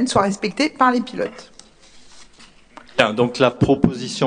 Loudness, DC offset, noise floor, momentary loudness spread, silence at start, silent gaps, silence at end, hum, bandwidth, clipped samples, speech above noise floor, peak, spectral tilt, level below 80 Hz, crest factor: -19 LUFS; under 0.1%; -47 dBFS; 10 LU; 0 s; none; 0 s; none; 10 kHz; under 0.1%; 29 dB; 0 dBFS; -5 dB/octave; -46 dBFS; 20 dB